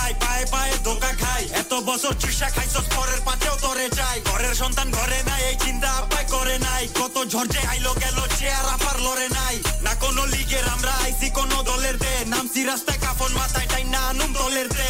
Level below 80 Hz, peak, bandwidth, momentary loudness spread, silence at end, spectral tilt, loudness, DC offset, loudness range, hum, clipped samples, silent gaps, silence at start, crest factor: -26 dBFS; -10 dBFS; 19.5 kHz; 1 LU; 0 s; -2.5 dB/octave; -22 LUFS; under 0.1%; 0 LU; none; under 0.1%; none; 0 s; 12 dB